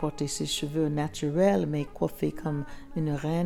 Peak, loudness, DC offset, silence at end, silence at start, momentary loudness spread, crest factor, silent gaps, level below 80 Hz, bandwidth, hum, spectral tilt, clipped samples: -12 dBFS; -29 LUFS; under 0.1%; 0 s; 0 s; 9 LU; 16 dB; none; -48 dBFS; 17 kHz; none; -5.5 dB/octave; under 0.1%